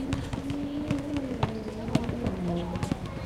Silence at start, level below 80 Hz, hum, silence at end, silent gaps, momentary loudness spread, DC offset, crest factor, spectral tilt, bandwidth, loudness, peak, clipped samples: 0 s; -42 dBFS; none; 0 s; none; 3 LU; under 0.1%; 22 dB; -7 dB/octave; 15 kHz; -32 LUFS; -8 dBFS; under 0.1%